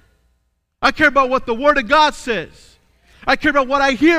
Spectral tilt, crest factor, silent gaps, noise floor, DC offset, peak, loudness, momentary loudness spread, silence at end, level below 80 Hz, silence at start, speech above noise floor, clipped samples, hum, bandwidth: -3.5 dB/octave; 16 dB; none; -66 dBFS; under 0.1%; -2 dBFS; -16 LUFS; 10 LU; 0 s; -42 dBFS; 0.8 s; 51 dB; under 0.1%; none; 14.5 kHz